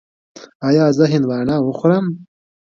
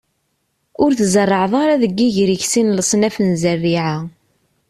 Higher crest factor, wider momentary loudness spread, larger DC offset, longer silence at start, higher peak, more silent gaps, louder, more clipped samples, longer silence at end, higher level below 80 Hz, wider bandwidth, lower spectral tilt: about the same, 16 dB vs 14 dB; first, 11 LU vs 5 LU; neither; second, 0.35 s vs 0.8 s; about the same, 0 dBFS vs -2 dBFS; first, 0.55-0.60 s vs none; about the same, -16 LUFS vs -16 LUFS; neither; about the same, 0.5 s vs 0.6 s; about the same, -56 dBFS vs -52 dBFS; second, 7.4 kHz vs 14 kHz; first, -7.5 dB/octave vs -5 dB/octave